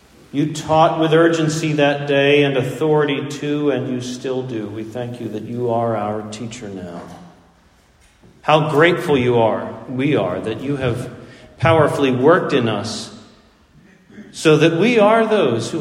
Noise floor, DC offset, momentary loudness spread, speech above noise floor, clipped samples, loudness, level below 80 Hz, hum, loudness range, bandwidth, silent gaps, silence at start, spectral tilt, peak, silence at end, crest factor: -53 dBFS; under 0.1%; 14 LU; 36 dB; under 0.1%; -17 LUFS; -52 dBFS; none; 8 LU; 15 kHz; none; 0.35 s; -6 dB/octave; 0 dBFS; 0 s; 18 dB